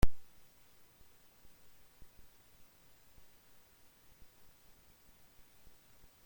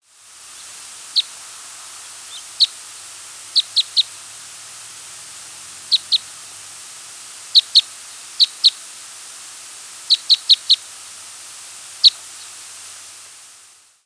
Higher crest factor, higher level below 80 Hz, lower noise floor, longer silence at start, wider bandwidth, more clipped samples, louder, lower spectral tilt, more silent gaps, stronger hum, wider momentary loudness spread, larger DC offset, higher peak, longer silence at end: about the same, 24 dB vs 22 dB; first, -48 dBFS vs -76 dBFS; first, -64 dBFS vs -48 dBFS; second, 0.05 s vs 1.15 s; first, 16.5 kHz vs 11 kHz; neither; second, -57 LUFS vs -15 LUFS; first, -6 dB/octave vs 3.5 dB/octave; neither; neither; second, 1 LU vs 21 LU; neither; second, -14 dBFS vs 0 dBFS; first, 6.05 s vs 1.15 s